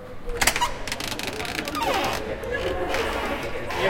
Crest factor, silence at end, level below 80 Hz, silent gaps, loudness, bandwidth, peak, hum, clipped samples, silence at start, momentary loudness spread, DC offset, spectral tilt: 24 dB; 0 s; -38 dBFS; none; -26 LUFS; 17 kHz; -2 dBFS; none; under 0.1%; 0 s; 7 LU; under 0.1%; -2.5 dB/octave